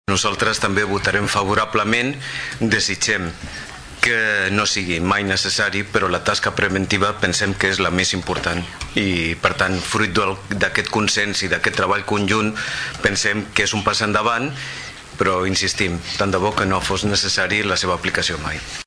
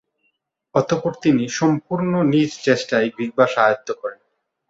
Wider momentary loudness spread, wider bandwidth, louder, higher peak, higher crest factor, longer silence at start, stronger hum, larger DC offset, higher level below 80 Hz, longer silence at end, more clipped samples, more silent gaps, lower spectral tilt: about the same, 6 LU vs 7 LU; first, 11 kHz vs 8 kHz; about the same, -19 LUFS vs -19 LUFS; about the same, -2 dBFS vs -2 dBFS; about the same, 18 dB vs 18 dB; second, 0.1 s vs 0.75 s; neither; neither; first, -42 dBFS vs -60 dBFS; second, 0.05 s vs 0.55 s; neither; neither; second, -3.5 dB/octave vs -6 dB/octave